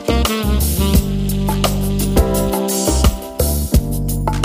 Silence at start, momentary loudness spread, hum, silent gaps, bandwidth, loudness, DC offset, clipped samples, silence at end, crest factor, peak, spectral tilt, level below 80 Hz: 0 s; 4 LU; none; none; 16 kHz; -17 LUFS; under 0.1%; under 0.1%; 0 s; 16 dB; 0 dBFS; -5 dB/octave; -20 dBFS